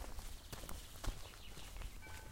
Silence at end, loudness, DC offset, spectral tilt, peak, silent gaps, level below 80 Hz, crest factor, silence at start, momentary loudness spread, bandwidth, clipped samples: 0 s; -51 LUFS; under 0.1%; -3.5 dB/octave; -28 dBFS; none; -50 dBFS; 20 dB; 0 s; 5 LU; 16.5 kHz; under 0.1%